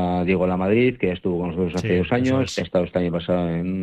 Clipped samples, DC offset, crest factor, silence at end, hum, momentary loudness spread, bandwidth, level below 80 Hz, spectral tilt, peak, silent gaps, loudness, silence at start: under 0.1%; under 0.1%; 14 dB; 0 s; none; 5 LU; 9 kHz; -46 dBFS; -7 dB/octave; -8 dBFS; none; -22 LUFS; 0 s